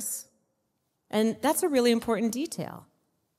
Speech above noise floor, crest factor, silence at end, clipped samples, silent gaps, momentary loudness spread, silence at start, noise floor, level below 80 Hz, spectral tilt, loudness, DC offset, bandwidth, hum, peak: 51 dB; 18 dB; 0.6 s; under 0.1%; none; 13 LU; 0 s; -77 dBFS; -68 dBFS; -4 dB/octave; -27 LUFS; under 0.1%; 16 kHz; none; -12 dBFS